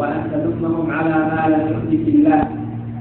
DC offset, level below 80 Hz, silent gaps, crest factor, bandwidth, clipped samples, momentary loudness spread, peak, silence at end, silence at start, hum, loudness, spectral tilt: under 0.1%; -44 dBFS; none; 16 dB; 4 kHz; under 0.1%; 8 LU; -2 dBFS; 0 s; 0 s; none; -18 LUFS; -13 dB/octave